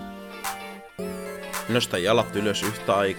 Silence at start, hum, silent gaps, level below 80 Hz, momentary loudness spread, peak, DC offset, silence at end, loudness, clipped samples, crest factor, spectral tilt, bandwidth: 0 s; none; none; -56 dBFS; 14 LU; -6 dBFS; under 0.1%; 0 s; -26 LUFS; under 0.1%; 20 dB; -4 dB/octave; 19 kHz